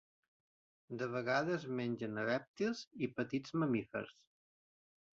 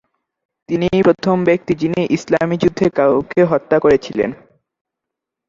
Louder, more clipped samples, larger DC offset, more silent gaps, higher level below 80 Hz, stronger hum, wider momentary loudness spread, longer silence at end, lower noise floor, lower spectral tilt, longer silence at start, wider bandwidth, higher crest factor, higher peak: second, -39 LUFS vs -16 LUFS; neither; neither; first, 2.48-2.54 s, 2.87-2.91 s vs none; second, -78 dBFS vs -48 dBFS; neither; first, 9 LU vs 6 LU; second, 1 s vs 1.15 s; first, under -90 dBFS vs -82 dBFS; second, -5 dB/octave vs -7 dB/octave; first, 0.9 s vs 0.7 s; about the same, 7.6 kHz vs 7.6 kHz; about the same, 20 dB vs 16 dB; second, -20 dBFS vs -2 dBFS